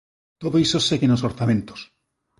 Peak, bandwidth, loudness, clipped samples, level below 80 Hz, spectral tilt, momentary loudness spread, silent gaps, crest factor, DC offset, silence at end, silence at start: -8 dBFS; 11.5 kHz; -21 LUFS; under 0.1%; -52 dBFS; -5.5 dB/octave; 15 LU; none; 14 dB; under 0.1%; 0.55 s; 0.4 s